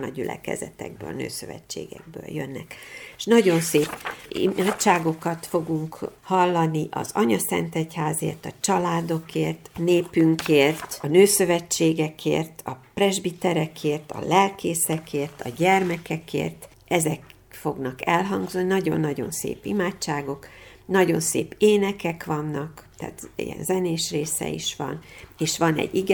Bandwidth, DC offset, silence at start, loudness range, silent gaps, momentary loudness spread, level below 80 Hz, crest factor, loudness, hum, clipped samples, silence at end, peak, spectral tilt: over 20 kHz; under 0.1%; 0 s; 5 LU; none; 15 LU; -58 dBFS; 20 dB; -24 LUFS; none; under 0.1%; 0 s; -4 dBFS; -4.5 dB/octave